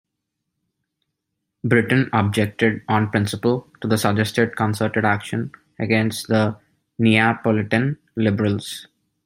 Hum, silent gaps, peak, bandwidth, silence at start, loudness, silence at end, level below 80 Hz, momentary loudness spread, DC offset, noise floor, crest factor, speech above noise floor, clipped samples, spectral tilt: none; none; -2 dBFS; 16 kHz; 1.65 s; -20 LUFS; 0.45 s; -58 dBFS; 11 LU; under 0.1%; -79 dBFS; 20 dB; 59 dB; under 0.1%; -6 dB/octave